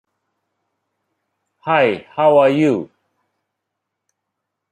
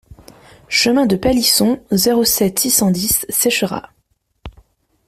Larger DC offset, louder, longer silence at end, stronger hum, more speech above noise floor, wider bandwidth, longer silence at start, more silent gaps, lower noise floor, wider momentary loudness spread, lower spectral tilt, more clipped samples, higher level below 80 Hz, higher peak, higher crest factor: neither; about the same, -15 LUFS vs -14 LUFS; first, 1.85 s vs 0.6 s; neither; first, 64 dB vs 49 dB; second, 9.4 kHz vs 16 kHz; first, 1.65 s vs 0.1 s; neither; first, -79 dBFS vs -64 dBFS; first, 9 LU vs 5 LU; first, -7 dB/octave vs -3 dB/octave; neither; second, -68 dBFS vs -42 dBFS; about the same, -2 dBFS vs 0 dBFS; about the same, 18 dB vs 16 dB